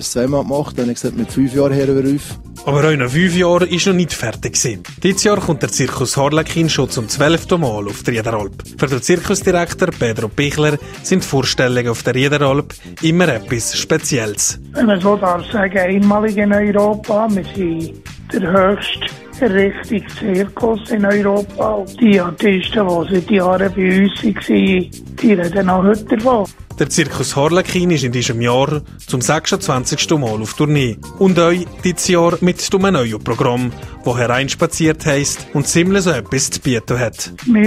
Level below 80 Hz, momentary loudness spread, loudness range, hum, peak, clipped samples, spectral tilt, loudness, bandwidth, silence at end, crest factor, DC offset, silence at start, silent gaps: -40 dBFS; 7 LU; 2 LU; none; 0 dBFS; under 0.1%; -5 dB/octave; -15 LUFS; 15.5 kHz; 0 s; 14 dB; under 0.1%; 0 s; none